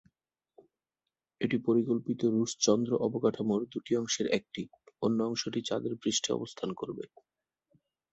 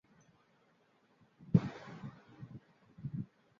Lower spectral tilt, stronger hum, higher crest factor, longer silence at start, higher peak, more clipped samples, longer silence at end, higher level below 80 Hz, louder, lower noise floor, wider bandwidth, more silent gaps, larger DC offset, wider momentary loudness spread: second, -4.5 dB/octave vs -9 dB/octave; neither; second, 20 dB vs 28 dB; about the same, 1.4 s vs 1.4 s; about the same, -12 dBFS vs -12 dBFS; neither; first, 1.05 s vs 0.35 s; second, -72 dBFS vs -66 dBFS; first, -31 LUFS vs -37 LUFS; first, -90 dBFS vs -71 dBFS; first, 8.2 kHz vs 7 kHz; neither; neither; second, 11 LU vs 21 LU